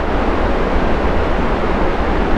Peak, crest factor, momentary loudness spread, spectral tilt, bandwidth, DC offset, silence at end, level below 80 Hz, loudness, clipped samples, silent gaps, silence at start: -2 dBFS; 12 dB; 0 LU; -7.5 dB/octave; 7.8 kHz; under 0.1%; 0 s; -18 dBFS; -18 LUFS; under 0.1%; none; 0 s